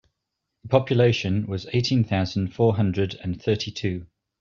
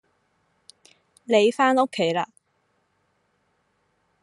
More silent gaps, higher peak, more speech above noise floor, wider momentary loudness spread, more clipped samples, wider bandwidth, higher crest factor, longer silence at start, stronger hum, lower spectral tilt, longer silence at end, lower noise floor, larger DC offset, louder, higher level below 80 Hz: neither; about the same, -4 dBFS vs -6 dBFS; first, 58 dB vs 50 dB; second, 8 LU vs 14 LU; neither; second, 7.2 kHz vs 11.5 kHz; about the same, 20 dB vs 20 dB; second, 0.65 s vs 1.3 s; neither; first, -7 dB/octave vs -4.5 dB/octave; second, 0.35 s vs 1.95 s; first, -81 dBFS vs -70 dBFS; neither; about the same, -24 LUFS vs -22 LUFS; first, -54 dBFS vs -80 dBFS